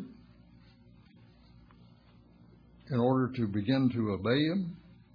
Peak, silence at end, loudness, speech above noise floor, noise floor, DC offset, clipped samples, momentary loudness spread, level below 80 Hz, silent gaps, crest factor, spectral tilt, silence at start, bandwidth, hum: -14 dBFS; 0.35 s; -30 LUFS; 30 dB; -59 dBFS; under 0.1%; under 0.1%; 11 LU; -64 dBFS; none; 18 dB; -9.5 dB/octave; 0 s; 5.2 kHz; none